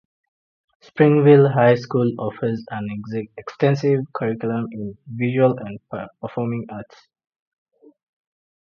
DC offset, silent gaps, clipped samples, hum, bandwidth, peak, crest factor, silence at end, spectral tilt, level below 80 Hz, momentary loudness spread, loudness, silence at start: under 0.1%; none; under 0.1%; none; 6.8 kHz; -2 dBFS; 20 dB; 1.8 s; -9 dB/octave; -62 dBFS; 19 LU; -20 LUFS; 0.95 s